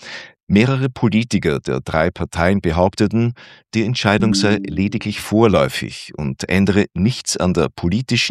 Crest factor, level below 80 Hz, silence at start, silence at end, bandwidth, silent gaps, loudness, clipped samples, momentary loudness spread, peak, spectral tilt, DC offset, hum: 18 dB; -42 dBFS; 0 s; 0 s; 14 kHz; 0.43-0.47 s; -18 LUFS; under 0.1%; 9 LU; 0 dBFS; -5.5 dB/octave; under 0.1%; none